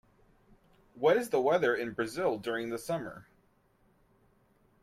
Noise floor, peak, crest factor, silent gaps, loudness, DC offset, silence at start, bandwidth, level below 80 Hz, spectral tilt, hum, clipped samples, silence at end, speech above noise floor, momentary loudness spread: -68 dBFS; -14 dBFS; 20 dB; none; -31 LUFS; under 0.1%; 0.95 s; 15.5 kHz; -68 dBFS; -5 dB/octave; none; under 0.1%; 1.6 s; 38 dB; 10 LU